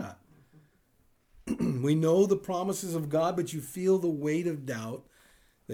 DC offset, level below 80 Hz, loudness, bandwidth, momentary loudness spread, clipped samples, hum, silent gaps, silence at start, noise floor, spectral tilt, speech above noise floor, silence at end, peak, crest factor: under 0.1%; -62 dBFS; -29 LUFS; over 20 kHz; 13 LU; under 0.1%; none; none; 0 s; -67 dBFS; -6.5 dB/octave; 39 dB; 0 s; -14 dBFS; 16 dB